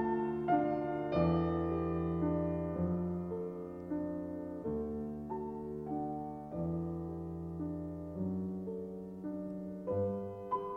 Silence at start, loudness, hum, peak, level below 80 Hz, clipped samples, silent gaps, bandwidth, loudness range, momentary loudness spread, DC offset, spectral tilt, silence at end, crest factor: 0 s; -38 LUFS; none; -18 dBFS; -56 dBFS; under 0.1%; none; 5.2 kHz; 6 LU; 10 LU; under 0.1%; -10.5 dB/octave; 0 s; 18 dB